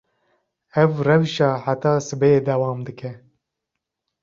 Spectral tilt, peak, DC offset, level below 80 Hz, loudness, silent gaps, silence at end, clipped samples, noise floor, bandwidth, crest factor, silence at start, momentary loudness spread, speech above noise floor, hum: -6.5 dB/octave; -2 dBFS; under 0.1%; -58 dBFS; -20 LUFS; none; 1.05 s; under 0.1%; -82 dBFS; 7.6 kHz; 20 dB; 0.75 s; 14 LU; 63 dB; none